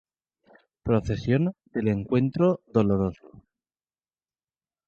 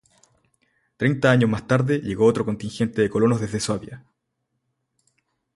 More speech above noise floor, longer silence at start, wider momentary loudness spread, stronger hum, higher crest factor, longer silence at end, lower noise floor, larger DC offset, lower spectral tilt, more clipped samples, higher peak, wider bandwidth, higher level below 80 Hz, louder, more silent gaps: first, over 66 dB vs 56 dB; second, 0.85 s vs 1 s; second, 6 LU vs 9 LU; neither; about the same, 18 dB vs 20 dB; about the same, 1.6 s vs 1.6 s; first, under -90 dBFS vs -77 dBFS; neither; first, -9 dB/octave vs -6.5 dB/octave; neither; second, -8 dBFS vs -4 dBFS; second, 7.2 kHz vs 11.5 kHz; about the same, -50 dBFS vs -54 dBFS; second, -25 LUFS vs -22 LUFS; neither